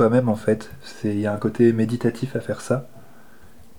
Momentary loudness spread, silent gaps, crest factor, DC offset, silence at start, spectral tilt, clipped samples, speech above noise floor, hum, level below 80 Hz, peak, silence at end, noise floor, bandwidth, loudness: 10 LU; none; 16 dB; 0.8%; 0 s; -7.5 dB/octave; under 0.1%; 29 dB; none; -58 dBFS; -6 dBFS; 0.8 s; -50 dBFS; 17.5 kHz; -22 LUFS